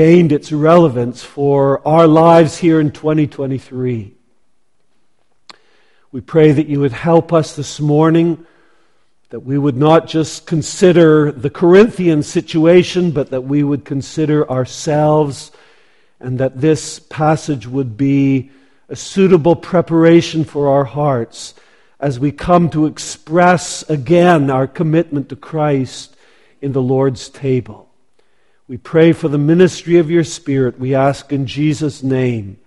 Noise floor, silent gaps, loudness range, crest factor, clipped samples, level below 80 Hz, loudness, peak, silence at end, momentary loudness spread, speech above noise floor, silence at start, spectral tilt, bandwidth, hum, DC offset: -65 dBFS; none; 6 LU; 14 dB; under 0.1%; -48 dBFS; -14 LUFS; 0 dBFS; 0.1 s; 12 LU; 52 dB; 0 s; -7 dB/octave; 11.5 kHz; none; 0.3%